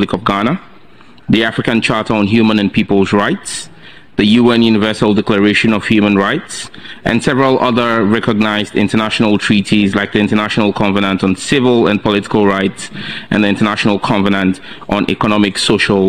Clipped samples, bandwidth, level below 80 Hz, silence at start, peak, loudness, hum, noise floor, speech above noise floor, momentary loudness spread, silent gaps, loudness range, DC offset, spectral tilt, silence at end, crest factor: under 0.1%; 10.5 kHz; -42 dBFS; 0 s; 0 dBFS; -13 LUFS; none; -43 dBFS; 30 dB; 9 LU; none; 2 LU; 1%; -5.5 dB/octave; 0 s; 12 dB